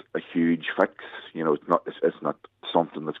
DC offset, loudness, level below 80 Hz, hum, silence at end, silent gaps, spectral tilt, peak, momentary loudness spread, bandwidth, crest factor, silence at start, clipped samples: under 0.1%; -26 LUFS; -78 dBFS; none; 0 s; none; -8 dB/octave; -6 dBFS; 9 LU; 4.6 kHz; 22 dB; 0.15 s; under 0.1%